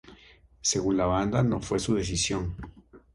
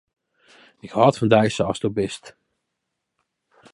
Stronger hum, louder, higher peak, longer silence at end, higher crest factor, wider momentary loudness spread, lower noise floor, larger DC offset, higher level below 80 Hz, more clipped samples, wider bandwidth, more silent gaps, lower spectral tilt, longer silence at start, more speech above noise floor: neither; second, -27 LUFS vs -20 LUFS; second, -10 dBFS vs -2 dBFS; second, 0.15 s vs 1.45 s; about the same, 18 dB vs 22 dB; about the same, 10 LU vs 12 LU; second, -56 dBFS vs -79 dBFS; neither; first, -44 dBFS vs -56 dBFS; neither; about the same, 11.5 kHz vs 11.5 kHz; neither; second, -4.5 dB/octave vs -6 dB/octave; second, 0.05 s vs 0.85 s; second, 29 dB vs 60 dB